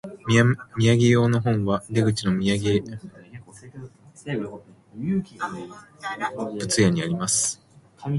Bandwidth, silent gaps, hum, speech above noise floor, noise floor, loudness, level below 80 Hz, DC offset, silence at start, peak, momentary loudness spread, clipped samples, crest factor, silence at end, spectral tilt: 11.5 kHz; none; none; 21 dB; -43 dBFS; -23 LUFS; -52 dBFS; under 0.1%; 0.05 s; -4 dBFS; 22 LU; under 0.1%; 20 dB; 0 s; -5 dB/octave